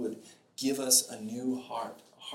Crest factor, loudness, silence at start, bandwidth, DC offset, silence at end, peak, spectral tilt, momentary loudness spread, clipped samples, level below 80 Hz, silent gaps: 24 dB; -30 LUFS; 0 s; 17 kHz; under 0.1%; 0 s; -10 dBFS; -1.5 dB/octave; 22 LU; under 0.1%; -82 dBFS; none